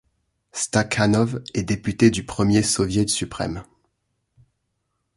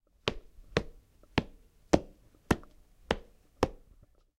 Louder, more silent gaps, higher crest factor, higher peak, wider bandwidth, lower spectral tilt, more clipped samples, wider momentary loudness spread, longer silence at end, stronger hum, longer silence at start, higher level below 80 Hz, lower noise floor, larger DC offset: first, -21 LUFS vs -34 LUFS; neither; second, 20 dB vs 30 dB; first, -2 dBFS vs -6 dBFS; second, 11.5 kHz vs 16 kHz; about the same, -4.5 dB/octave vs -5.5 dB/octave; neither; second, 10 LU vs 21 LU; first, 1.55 s vs 0.65 s; neither; first, 0.55 s vs 0.25 s; about the same, -46 dBFS vs -48 dBFS; first, -75 dBFS vs -61 dBFS; neither